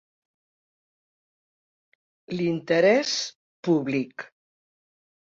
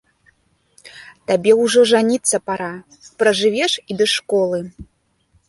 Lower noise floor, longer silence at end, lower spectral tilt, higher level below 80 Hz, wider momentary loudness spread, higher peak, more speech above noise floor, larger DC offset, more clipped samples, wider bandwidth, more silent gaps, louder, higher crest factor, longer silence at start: first, under -90 dBFS vs -60 dBFS; first, 1.05 s vs 0.65 s; first, -4.5 dB/octave vs -3 dB/octave; second, -72 dBFS vs -56 dBFS; about the same, 16 LU vs 14 LU; second, -8 dBFS vs -2 dBFS; first, over 67 dB vs 44 dB; neither; neither; second, 7.8 kHz vs 11.5 kHz; first, 3.35-3.63 s vs none; second, -24 LUFS vs -17 LUFS; about the same, 20 dB vs 16 dB; first, 2.3 s vs 0.85 s